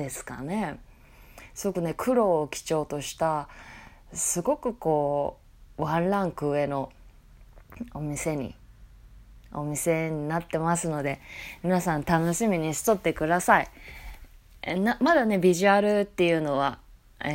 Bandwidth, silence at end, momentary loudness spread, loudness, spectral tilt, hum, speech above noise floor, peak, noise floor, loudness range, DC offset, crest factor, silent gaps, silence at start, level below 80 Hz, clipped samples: 16 kHz; 0 s; 18 LU; -26 LUFS; -5 dB/octave; none; 25 dB; -4 dBFS; -51 dBFS; 8 LU; under 0.1%; 22 dB; none; 0 s; -50 dBFS; under 0.1%